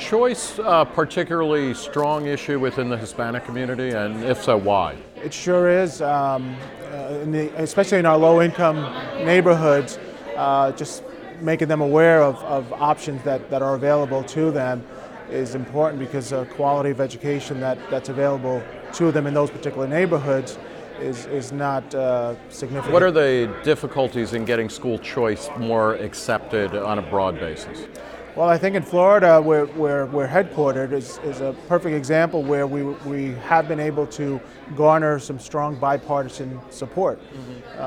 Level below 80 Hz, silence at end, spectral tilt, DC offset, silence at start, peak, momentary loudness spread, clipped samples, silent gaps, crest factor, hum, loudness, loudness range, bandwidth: -54 dBFS; 0 s; -6 dB/octave; under 0.1%; 0 s; -2 dBFS; 14 LU; under 0.1%; none; 18 dB; none; -21 LUFS; 5 LU; 14.5 kHz